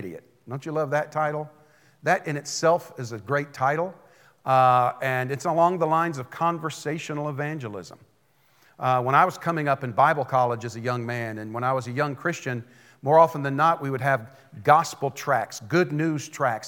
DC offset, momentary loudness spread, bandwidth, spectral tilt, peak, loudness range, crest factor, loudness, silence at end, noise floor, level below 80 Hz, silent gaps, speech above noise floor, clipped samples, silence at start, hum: under 0.1%; 13 LU; 18 kHz; -5.5 dB/octave; -4 dBFS; 4 LU; 22 dB; -24 LUFS; 0 s; -64 dBFS; -80 dBFS; none; 40 dB; under 0.1%; 0 s; none